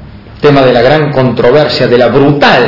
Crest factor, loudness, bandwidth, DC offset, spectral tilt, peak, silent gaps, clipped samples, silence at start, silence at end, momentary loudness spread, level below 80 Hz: 6 dB; -7 LUFS; 6 kHz; under 0.1%; -7 dB/octave; 0 dBFS; none; 5%; 0 s; 0 s; 3 LU; -34 dBFS